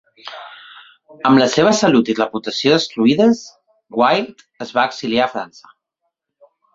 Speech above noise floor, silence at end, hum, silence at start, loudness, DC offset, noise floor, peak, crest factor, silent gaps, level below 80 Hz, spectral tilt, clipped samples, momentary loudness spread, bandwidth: 59 dB; 1.3 s; none; 0.25 s; -16 LUFS; under 0.1%; -75 dBFS; 0 dBFS; 18 dB; none; -60 dBFS; -4.5 dB/octave; under 0.1%; 20 LU; 7.8 kHz